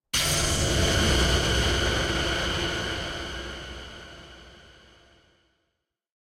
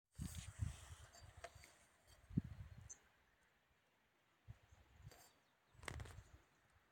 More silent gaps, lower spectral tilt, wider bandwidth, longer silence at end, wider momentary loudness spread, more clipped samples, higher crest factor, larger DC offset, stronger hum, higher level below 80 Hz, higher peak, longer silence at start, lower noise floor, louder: neither; second, -3 dB/octave vs -5 dB/octave; about the same, 16.5 kHz vs 17 kHz; first, 1.75 s vs 0.15 s; about the same, 18 LU vs 18 LU; neither; second, 18 dB vs 30 dB; neither; neither; first, -34 dBFS vs -64 dBFS; first, -10 dBFS vs -26 dBFS; about the same, 0.15 s vs 0.15 s; about the same, -80 dBFS vs -80 dBFS; first, -24 LUFS vs -54 LUFS